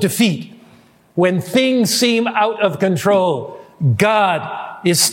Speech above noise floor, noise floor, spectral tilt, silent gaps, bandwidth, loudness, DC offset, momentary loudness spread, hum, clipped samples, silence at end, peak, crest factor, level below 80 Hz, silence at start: 33 dB; -49 dBFS; -4.5 dB/octave; none; 17 kHz; -16 LUFS; under 0.1%; 12 LU; none; under 0.1%; 0 s; 0 dBFS; 16 dB; -60 dBFS; 0 s